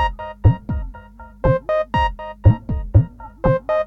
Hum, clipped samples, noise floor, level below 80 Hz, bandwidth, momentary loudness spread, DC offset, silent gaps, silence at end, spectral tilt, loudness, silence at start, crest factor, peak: none; under 0.1%; -40 dBFS; -26 dBFS; 6 kHz; 10 LU; under 0.1%; none; 0 s; -9.5 dB/octave; -20 LUFS; 0 s; 18 dB; 0 dBFS